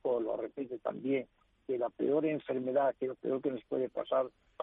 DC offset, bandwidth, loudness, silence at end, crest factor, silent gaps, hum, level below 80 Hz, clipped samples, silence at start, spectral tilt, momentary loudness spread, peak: under 0.1%; 3.9 kHz; -35 LUFS; 0 s; 16 dB; none; none; -76 dBFS; under 0.1%; 0.05 s; -9.5 dB/octave; 8 LU; -20 dBFS